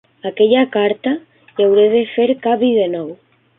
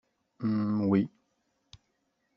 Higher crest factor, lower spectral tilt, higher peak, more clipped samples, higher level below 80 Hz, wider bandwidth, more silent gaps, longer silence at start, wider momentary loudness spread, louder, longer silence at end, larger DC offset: about the same, 14 dB vs 18 dB; first, -10.5 dB/octave vs -9 dB/octave; first, -2 dBFS vs -14 dBFS; neither; first, -64 dBFS vs -70 dBFS; second, 3.9 kHz vs 6.4 kHz; neither; second, 0.25 s vs 0.4 s; first, 13 LU vs 9 LU; first, -15 LUFS vs -30 LUFS; second, 0.45 s vs 1.3 s; neither